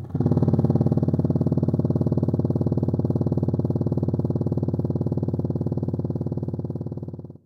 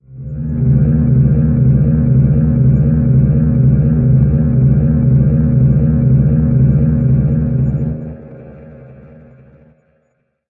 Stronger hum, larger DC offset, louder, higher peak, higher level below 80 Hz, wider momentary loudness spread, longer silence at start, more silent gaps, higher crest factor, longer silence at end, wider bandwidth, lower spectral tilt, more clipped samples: neither; neither; second, -24 LUFS vs -12 LUFS; second, -6 dBFS vs 0 dBFS; second, -50 dBFS vs -24 dBFS; about the same, 8 LU vs 6 LU; about the same, 0 s vs 0.1 s; neither; about the same, 16 dB vs 12 dB; second, 0.1 s vs 1.6 s; first, 5.6 kHz vs 2.5 kHz; second, -12 dB/octave vs -15 dB/octave; neither